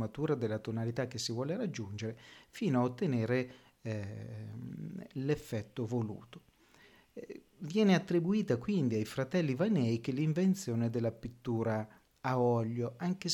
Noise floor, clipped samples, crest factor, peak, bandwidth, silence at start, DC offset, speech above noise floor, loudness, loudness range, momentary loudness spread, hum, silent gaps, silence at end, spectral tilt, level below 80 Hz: -63 dBFS; under 0.1%; 18 dB; -16 dBFS; 18 kHz; 0 s; under 0.1%; 29 dB; -34 LUFS; 8 LU; 14 LU; none; none; 0 s; -6.5 dB/octave; -68 dBFS